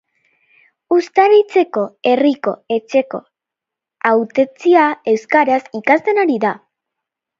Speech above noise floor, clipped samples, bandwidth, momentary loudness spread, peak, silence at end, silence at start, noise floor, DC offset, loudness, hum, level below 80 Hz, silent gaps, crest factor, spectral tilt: 70 dB; under 0.1%; 7.6 kHz; 9 LU; 0 dBFS; 0.8 s; 0.9 s; -84 dBFS; under 0.1%; -15 LUFS; none; -70 dBFS; none; 16 dB; -5.5 dB/octave